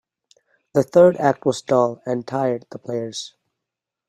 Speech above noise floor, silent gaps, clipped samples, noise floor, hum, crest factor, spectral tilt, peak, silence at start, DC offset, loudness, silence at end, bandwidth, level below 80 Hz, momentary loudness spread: 65 dB; none; under 0.1%; -84 dBFS; none; 20 dB; -6 dB/octave; -2 dBFS; 0.75 s; under 0.1%; -20 LUFS; 0.8 s; 12 kHz; -62 dBFS; 15 LU